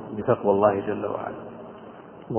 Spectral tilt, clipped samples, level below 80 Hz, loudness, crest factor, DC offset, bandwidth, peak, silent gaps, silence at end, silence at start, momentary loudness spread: -11.5 dB/octave; under 0.1%; -58 dBFS; -24 LUFS; 20 dB; under 0.1%; 3.3 kHz; -6 dBFS; none; 0 s; 0 s; 23 LU